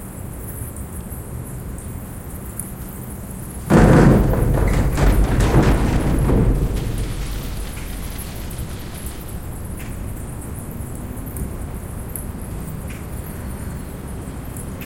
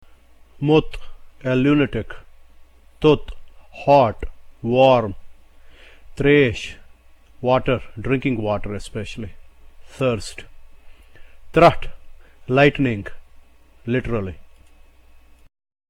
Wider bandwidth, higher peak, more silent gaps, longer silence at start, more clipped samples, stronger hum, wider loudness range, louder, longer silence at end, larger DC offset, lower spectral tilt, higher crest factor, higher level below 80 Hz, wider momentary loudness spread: first, 17 kHz vs 12 kHz; about the same, 0 dBFS vs -2 dBFS; neither; second, 0 s vs 0.55 s; neither; neither; first, 14 LU vs 5 LU; second, -22 LUFS vs -19 LUFS; second, 0 s vs 1.5 s; neither; about the same, -6.5 dB/octave vs -7 dB/octave; about the same, 20 dB vs 20 dB; first, -24 dBFS vs -38 dBFS; second, 15 LU vs 21 LU